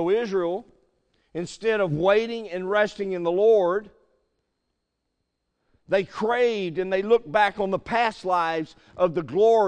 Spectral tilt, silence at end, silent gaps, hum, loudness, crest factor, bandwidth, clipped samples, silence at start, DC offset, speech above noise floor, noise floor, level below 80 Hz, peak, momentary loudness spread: -6 dB/octave; 0 s; none; none; -24 LUFS; 18 dB; 9.2 kHz; under 0.1%; 0 s; under 0.1%; 56 dB; -78 dBFS; -60 dBFS; -6 dBFS; 10 LU